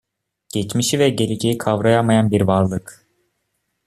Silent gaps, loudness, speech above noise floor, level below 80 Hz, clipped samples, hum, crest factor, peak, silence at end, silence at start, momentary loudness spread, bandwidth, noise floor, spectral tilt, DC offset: none; -18 LUFS; 55 dB; -52 dBFS; under 0.1%; none; 16 dB; -2 dBFS; 0.95 s; 0.55 s; 9 LU; 14.5 kHz; -72 dBFS; -5.5 dB/octave; under 0.1%